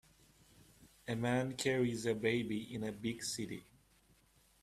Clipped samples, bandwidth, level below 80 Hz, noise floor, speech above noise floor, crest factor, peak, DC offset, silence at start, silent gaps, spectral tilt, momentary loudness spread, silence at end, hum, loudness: under 0.1%; 15 kHz; -68 dBFS; -70 dBFS; 33 dB; 20 dB; -20 dBFS; under 0.1%; 0.8 s; none; -5 dB/octave; 9 LU; 1 s; none; -38 LUFS